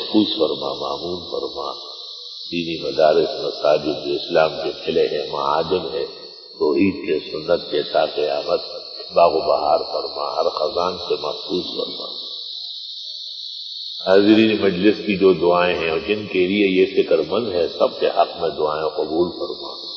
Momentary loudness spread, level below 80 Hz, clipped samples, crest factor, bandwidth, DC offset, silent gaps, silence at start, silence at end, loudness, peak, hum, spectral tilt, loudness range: 12 LU; -54 dBFS; under 0.1%; 18 dB; 6.4 kHz; under 0.1%; none; 0 s; 0 s; -20 LUFS; -2 dBFS; none; -6 dB/octave; 5 LU